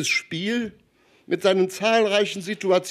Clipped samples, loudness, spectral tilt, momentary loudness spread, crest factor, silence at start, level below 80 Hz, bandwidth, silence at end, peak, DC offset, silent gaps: under 0.1%; -22 LUFS; -3.5 dB/octave; 9 LU; 16 dB; 0 s; -68 dBFS; 14 kHz; 0 s; -6 dBFS; under 0.1%; none